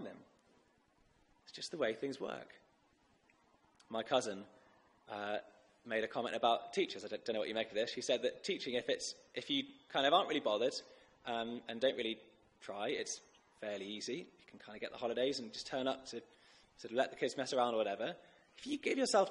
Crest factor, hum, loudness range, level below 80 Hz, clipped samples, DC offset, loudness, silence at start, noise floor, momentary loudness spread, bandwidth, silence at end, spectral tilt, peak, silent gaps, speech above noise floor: 22 dB; none; 7 LU; -80 dBFS; under 0.1%; under 0.1%; -39 LUFS; 0 s; -73 dBFS; 15 LU; 11 kHz; 0 s; -3 dB/octave; -18 dBFS; none; 35 dB